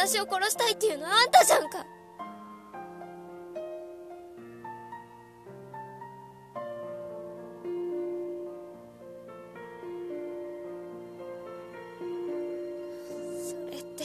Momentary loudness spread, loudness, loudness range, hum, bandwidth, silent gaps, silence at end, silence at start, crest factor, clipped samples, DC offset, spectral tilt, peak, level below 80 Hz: 21 LU; -29 LUFS; 18 LU; none; 14 kHz; none; 0 s; 0 s; 26 dB; under 0.1%; under 0.1%; -1.5 dB/octave; -6 dBFS; -74 dBFS